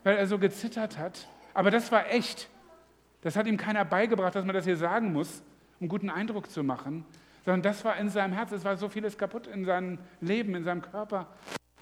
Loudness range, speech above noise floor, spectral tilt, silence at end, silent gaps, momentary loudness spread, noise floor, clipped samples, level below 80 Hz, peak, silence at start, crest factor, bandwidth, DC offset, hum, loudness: 3 LU; 31 dB; -6 dB/octave; 0.25 s; none; 13 LU; -60 dBFS; under 0.1%; -72 dBFS; -8 dBFS; 0.05 s; 22 dB; 15.5 kHz; under 0.1%; none; -30 LUFS